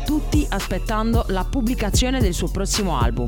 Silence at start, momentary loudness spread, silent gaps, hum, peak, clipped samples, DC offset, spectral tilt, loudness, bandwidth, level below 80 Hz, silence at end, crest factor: 0 s; 4 LU; none; none; -6 dBFS; under 0.1%; 0.1%; -5 dB/octave; -22 LUFS; 18.5 kHz; -24 dBFS; 0 s; 14 dB